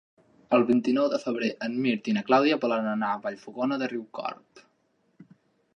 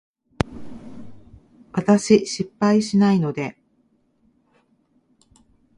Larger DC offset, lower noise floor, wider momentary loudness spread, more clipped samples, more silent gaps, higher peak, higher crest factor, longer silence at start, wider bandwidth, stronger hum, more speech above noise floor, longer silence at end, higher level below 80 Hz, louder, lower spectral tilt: neither; first, -70 dBFS vs -64 dBFS; second, 13 LU vs 23 LU; neither; neither; second, -6 dBFS vs 0 dBFS; about the same, 20 dB vs 22 dB; about the same, 0.5 s vs 0.45 s; second, 7.2 kHz vs 11 kHz; neither; about the same, 44 dB vs 46 dB; second, 0.5 s vs 2.25 s; second, -76 dBFS vs -48 dBFS; second, -26 LUFS vs -20 LUFS; about the same, -6 dB/octave vs -6 dB/octave